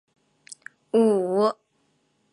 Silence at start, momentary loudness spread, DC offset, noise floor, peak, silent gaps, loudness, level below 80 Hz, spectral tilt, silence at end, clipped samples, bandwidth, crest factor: 0.95 s; 23 LU; under 0.1%; -69 dBFS; -8 dBFS; none; -22 LUFS; -80 dBFS; -6.5 dB/octave; 0.8 s; under 0.1%; 11.5 kHz; 16 dB